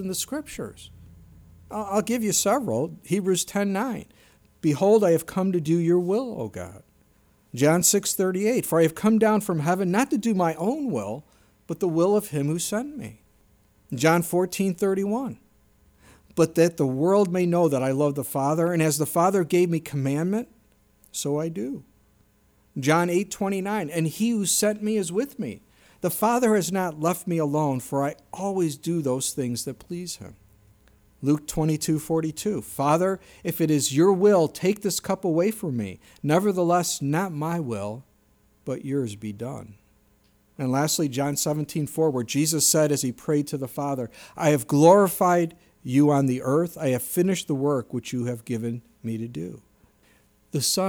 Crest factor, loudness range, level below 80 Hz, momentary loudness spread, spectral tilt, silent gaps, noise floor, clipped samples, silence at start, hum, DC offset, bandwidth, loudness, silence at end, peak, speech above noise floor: 20 dB; 7 LU; -60 dBFS; 14 LU; -5 dB/octave; none; -62 dBFS; under 0.1%; 0 s; none; under 0.1%; over 20 kHz; -24 LUFS; 0 s; -4 dBFS; 38 dB